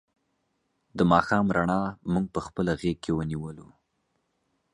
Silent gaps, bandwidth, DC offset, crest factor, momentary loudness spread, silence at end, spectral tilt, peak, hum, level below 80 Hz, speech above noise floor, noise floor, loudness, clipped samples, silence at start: none; 11 kHz; under 0.1%; 24 dB; 12 LU; 1.1 s; -7 dB/octave; -6 dBFS; none; -50 dBFS; 49 dB; -75 dBFS; -26 LUFS; under 0.1%; 0.95 s